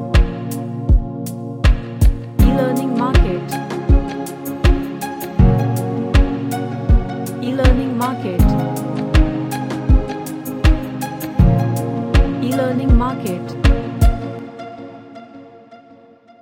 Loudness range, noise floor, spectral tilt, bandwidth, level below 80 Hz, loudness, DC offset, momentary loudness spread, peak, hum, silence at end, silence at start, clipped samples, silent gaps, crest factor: 1 LU; -45 dBFS; -7 dB/octave; 17 kHz; -18 dBFS; -18 LUFS; under 0.1%; 11 LU; 0 dBFS; none; 0.65 s; 0 s; under 0.1%; none; 16 dB